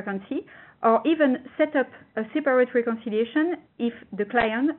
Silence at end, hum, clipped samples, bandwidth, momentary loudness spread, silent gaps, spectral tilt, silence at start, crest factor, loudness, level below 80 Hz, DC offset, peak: 0 s; none; under 0.1%; 4.2 kHz; 10 LU; none; -3.5 dB/octave; 0 s; 18 dB; -25 LUFS; -60 dBFS; under 0.1%; -6 dBFS